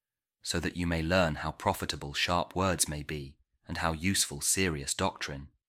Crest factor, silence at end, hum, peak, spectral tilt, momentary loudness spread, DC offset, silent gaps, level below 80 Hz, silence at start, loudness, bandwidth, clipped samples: 20 dB; 0.2 s; none; -12 dBFS; -3.5 dB/octave; 11 LU; under 0.1%; none; -48 dBFS; 0.45 s; -30 LUFS; 16 kHz; under 0.1%